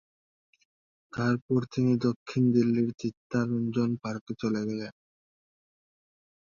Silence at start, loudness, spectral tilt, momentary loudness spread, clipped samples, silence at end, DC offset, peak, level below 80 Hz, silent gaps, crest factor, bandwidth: 1.15 s; -29 LUFS; -8 dB/octave; 11 LU; under 0.1%; 1.65 s; under 0.1%; -12 dBFS; -66 dBFS; 1.42-1.49 s, 2.16-2.26 s, 2.94-2.98 s, 3.17-3.30 s, 4.21-4.27 s; 18 dB; 7.2 kHz